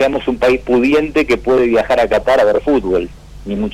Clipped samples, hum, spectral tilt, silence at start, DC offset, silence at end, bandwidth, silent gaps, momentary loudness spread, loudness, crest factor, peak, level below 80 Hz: under 0.1%; none; -6 dB/octave; 0 s; under 0.1%; 0 s; 14.5 kHz; none; 8 LU; -14 LUFS; 8 dB; -6 dBFS; -34 dBFS